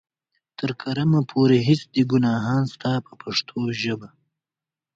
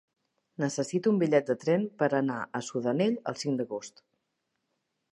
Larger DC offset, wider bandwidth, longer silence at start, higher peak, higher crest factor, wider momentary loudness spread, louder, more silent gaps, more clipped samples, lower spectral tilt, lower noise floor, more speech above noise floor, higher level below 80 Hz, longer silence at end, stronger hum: neither; second, 7.8 kHz vs 11.5 kHz; about the same, 0.6 s vs 0.6 s; first, -6 dBFS vs -10 dBFS; about the same, 18 dB vs 20 dB; about the same, 10 LU vs 9 LU; first, -22 LUFS vs -29 LUFS; neither; neither; about the same, -7 dB/octave vs -6 dB/octave; first, -90 dBFS vs -81 dBFS; first, 68 dB vs 52 dB; first, -60 dBFS vs -80 dBFS; second, 0.9 s vs 1.25 s; neither